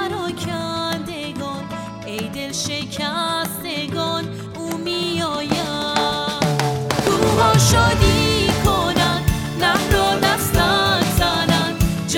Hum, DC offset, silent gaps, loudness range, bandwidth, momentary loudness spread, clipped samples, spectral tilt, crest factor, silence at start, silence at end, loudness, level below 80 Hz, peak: none; under 0.1%; none; 8 LU; 19 kHz; 12 LU; under 0.1%; -4 dB/octave; 16 dB; 0 s; 0 s; -19 LUFS; -32 dBFS; -2 dBFS